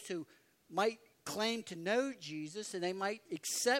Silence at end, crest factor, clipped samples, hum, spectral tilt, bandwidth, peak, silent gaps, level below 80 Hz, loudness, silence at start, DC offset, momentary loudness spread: 0 s; 20 dB; under 0.1%; none; -2.5 dB/octave; 16 kHz; -18 dBFS; none; -86 dBFS; -38 LUFS; 0 s; under 0.1%; 9 LU